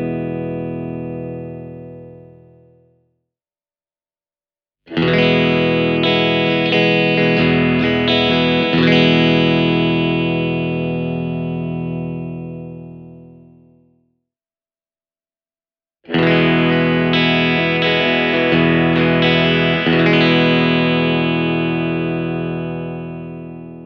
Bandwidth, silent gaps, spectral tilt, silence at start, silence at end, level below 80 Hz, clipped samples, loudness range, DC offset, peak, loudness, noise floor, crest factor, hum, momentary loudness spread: 6.4 kHz; none; -7.5 dB/octave; 0 s; 0 s; -46 dBFS; under 0.1%; 15 LU; under 0.1%; -2 dBFS; -15 LUFS; under -90 dBFS; 16 dB; none; 15 LU